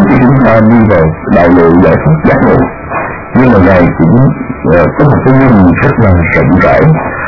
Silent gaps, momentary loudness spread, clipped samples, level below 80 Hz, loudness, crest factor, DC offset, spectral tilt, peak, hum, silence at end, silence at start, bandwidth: none; 6 LU; 3%; -26 dBFS; -6 LUFS; 6 dB; under 0.1%; -10.5 dB/octave; 0 dBFS; none; 0 s; 0 s; 6 kHz